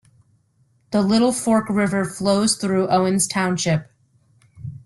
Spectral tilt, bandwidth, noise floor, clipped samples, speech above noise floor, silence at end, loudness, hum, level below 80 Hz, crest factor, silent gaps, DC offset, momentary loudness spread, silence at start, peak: -4.5 dB/octave; 12.5 kHz; -62 dBFS; under 0.1%; 43 dB; 0.1 s; -19 LUFS; none; -56 dBFS; 16 dB; none; under 0.1%; 6 LU; 0.9 s; -6 dBFS